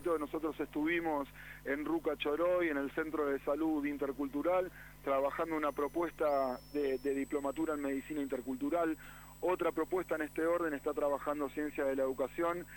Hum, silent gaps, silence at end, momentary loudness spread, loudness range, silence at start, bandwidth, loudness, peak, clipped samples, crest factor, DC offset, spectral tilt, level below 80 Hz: 50 Hz at -60 dBFS; none; 0 s; 5 LU; 2 LU; 0 s; 19 kHz; -36 LUFS; -22 dBFS; under 0.1%; 14 dB; under 0.1%; -5.5 dB/octave; -60 dBFS